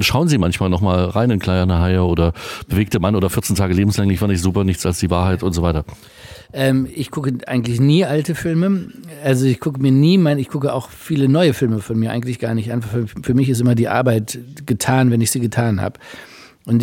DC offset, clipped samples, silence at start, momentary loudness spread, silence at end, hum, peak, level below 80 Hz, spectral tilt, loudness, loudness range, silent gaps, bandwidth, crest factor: under 0.1%; under 0.1%; 0 s; 9 LU; 0 s; none; 0 dBFS; -40 dBFS; -6 dB/octave; -17 LUFS; 2 LU; none; 17 kHz; 16 dB